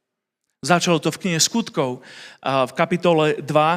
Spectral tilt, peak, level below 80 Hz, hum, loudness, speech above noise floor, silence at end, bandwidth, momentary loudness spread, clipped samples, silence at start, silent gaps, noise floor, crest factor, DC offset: -4 dB/octave; 0 dBFS; -66 dBFS; none; -20 LUFS; 59 dB; 0 s; 16 kHz; 12 LU; under 0.1%; 0.65 s; none; -79 dBFS; 20 dB; under 0.1%